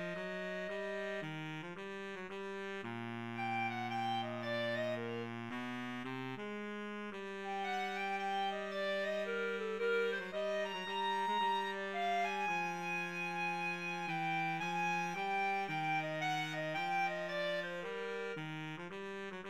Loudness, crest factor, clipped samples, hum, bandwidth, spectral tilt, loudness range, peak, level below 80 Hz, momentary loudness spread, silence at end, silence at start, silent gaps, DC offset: -39 LUFS; 14 dB; under 0.1%; none; 15.5 kHz; -5 dB/octave; 5 LU; -24 dBFS; -82 dBFS; 8 LU; 0 s; 0 s; none; under 0.1%